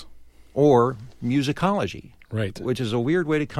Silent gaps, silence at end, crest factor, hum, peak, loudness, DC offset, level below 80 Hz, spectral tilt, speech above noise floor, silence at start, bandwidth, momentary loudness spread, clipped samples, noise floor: none; 0 s; 18 dB; none; -6 dBFS; -23 LUFS; under 0.1%; -52 dBFS; -7 dB/octave; 23 dB; 0 s; 13 kHz; 14 LU; under 0.1%; -45 dBFS